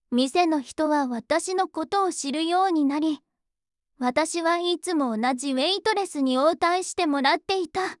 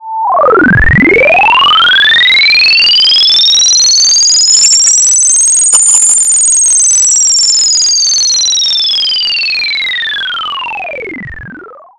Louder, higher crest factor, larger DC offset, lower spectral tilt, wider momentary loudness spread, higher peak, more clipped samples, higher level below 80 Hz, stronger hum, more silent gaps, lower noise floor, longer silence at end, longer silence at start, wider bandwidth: second, -24 LUFS vs -4 LUFS; first, 16 dB vs 8 dB; neither; first, -2.5 dB/octave vs 0 dB/octave; second, 5 LU vs 10 LU; second, -8 dBFS vs 0 dBFS; second, under 0.1% vs 0.5%; second, -68 dBFS vs -28 dBFS; neither; neither; first, -86 dBFS vs -30 dBFS; second, 0.05 s vs 0.2 s; about the same, 0.1 s vs 0 s; about the same, 12 kHz vs 12 kHz